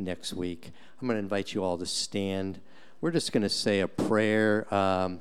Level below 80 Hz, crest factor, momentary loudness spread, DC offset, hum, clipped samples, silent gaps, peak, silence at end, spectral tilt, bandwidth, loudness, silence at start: -62 dBFS; 16 dB; 11 LU; 0.6%; none; under 0.1%; none; -12 dBFS; 0 s; -4.5 dB/octave; 14.5 kHz; -29 LUFS; 0 s